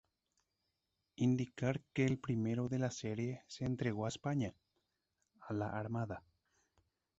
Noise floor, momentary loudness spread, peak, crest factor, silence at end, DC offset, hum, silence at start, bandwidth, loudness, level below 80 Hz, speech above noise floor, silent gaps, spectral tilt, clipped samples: -87 dBFS; 7 LU; -22 dBFS; 18 dB; 1 s; under 0.1%; none; 1.2 s; 8 kHz; -39 LUFS; -68 dBFS; 49 dB; none; -7 dB/octave; under 0.1%